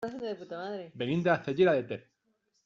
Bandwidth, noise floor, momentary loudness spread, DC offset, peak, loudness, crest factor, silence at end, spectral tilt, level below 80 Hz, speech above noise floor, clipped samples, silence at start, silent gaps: 7.2 kHz; -76 dBFS; 14 LU; under 0.1%; -12 dBFS; -30 LUFS; 20 dB; 0.65 s; -5 dB/octave; -70 dBFS; 46 dB; under 0.1%; 0 s; none